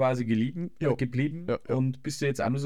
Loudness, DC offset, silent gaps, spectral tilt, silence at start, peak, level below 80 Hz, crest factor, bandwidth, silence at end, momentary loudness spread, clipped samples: -29 LUFS; 0.4%; none; -7 dB/octave; 0 s; -14 dBFS; -60 dBFS; 14 dB; 13.5 kHz; 0 s; 3 LU; under 0.1%